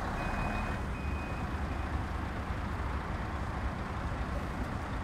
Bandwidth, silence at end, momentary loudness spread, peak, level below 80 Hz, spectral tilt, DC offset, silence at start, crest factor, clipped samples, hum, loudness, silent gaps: 13.5 kHz; 0 s; 3 LU; -22 dBFS; -40 dBFS; -6.5 dB/octave; under 0.1%; 0 s; 14 dB; under 0.1%; none; -37 LUFS; none